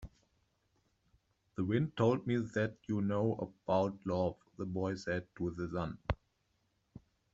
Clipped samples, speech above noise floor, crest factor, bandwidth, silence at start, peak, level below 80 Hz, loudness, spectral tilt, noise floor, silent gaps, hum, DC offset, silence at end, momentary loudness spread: under 0.1%; 43 dB; 22 dB; 7.8 kHz; 0 s; -16 dBFS; -58 dBFS; -36 LUFS; -7 dB/octave; -78 dBFS; none; none; under 0.1%; 0.35 s; 9 LU